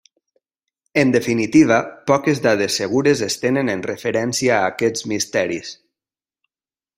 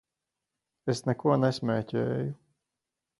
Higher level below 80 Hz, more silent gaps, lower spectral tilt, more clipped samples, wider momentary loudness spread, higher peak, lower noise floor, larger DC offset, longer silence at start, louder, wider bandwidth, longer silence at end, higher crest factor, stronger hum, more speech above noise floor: first, -58 dBFS vs -66 dBFS; neither; second, -4.5 dB/octave vs -7 dB/octave; neither; second, 7 LU vs 12 LU; first, -2 dBFS vs -10 dBFS; about the same, under -90 dBFS vs -87 dBFS; neither; about the same, 0.95 s vs 0.85 s; first, -18 LUFS vs -29 LUFS; first, 16 kHz vs 11.5 kHz; first, 1.25 s vs 0.85 s; about the same, 18 dB vs 20 dB; neither; first, over 72 dB vs 60 dB